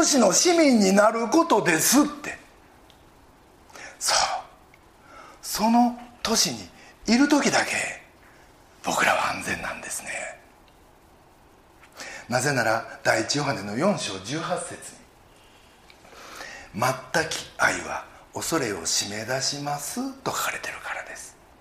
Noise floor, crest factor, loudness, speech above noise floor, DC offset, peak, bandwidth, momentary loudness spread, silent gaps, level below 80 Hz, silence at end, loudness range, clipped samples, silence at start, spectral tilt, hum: -54 dBFS; 20 dB; -23 LUFS; 31 dB; under 0.1%; -4 dBFS; 15.5 kHz; 20 LU; none; -58 dBFS; 0.3 s; 7 LU; under 0.1%; 0 s; -3 dB/octave; none